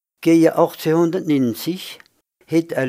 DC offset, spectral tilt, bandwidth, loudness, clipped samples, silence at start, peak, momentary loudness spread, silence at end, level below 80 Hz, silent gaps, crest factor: under 0.1%; -6.5 dB/octave; 16 kHz; -18 LUFS; under 0.1%; 0.2 s; -2 dBFS; 12 LU; 0 s; -68 dBFS; none; 18 dB